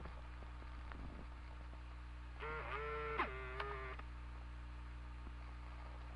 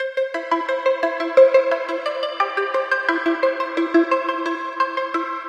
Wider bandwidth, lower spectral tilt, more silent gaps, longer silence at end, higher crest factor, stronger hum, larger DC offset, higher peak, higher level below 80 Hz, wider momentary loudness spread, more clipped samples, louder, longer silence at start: first, 10.5 kHz vs 8.4 kHz; first, -6.5 dB/octave vs -3 dB/octave; neither; about the same, 0 s vs 0 s; first, 22 dB vs 16 dB; first, 60 Hz at -50 dBFS vs none; neither; second, -26 dBFS vs -4 dBFS; first, -52 dBFS vs -76 dBFS; about the same, 11 LU vs 9 LU; neither; second, -49 LUFS vs -20 LUFS; about the same, 0 s vs 0 s